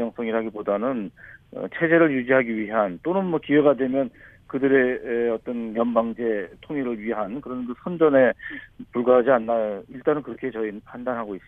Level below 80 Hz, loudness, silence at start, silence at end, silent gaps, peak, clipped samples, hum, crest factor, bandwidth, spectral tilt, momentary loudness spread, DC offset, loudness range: -58 dBFS; -23 LUFS; 0 s; 0.1 s; none; -4 dBFS; under 0.1%; none; 18 dB; 3.8 kHz; -9.5 dB/octave; 13 LU; under 0.1%; 3 LU